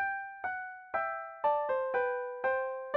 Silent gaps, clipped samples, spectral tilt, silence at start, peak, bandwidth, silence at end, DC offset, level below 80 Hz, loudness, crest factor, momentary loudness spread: none; under 0.1%; -5.5 dB/octave; 0 s; -18 dBFS; 4.4 kHz; 0 s; under 0.1%; -74 dBFS; -34 LUFS; 16 dB; 7 LU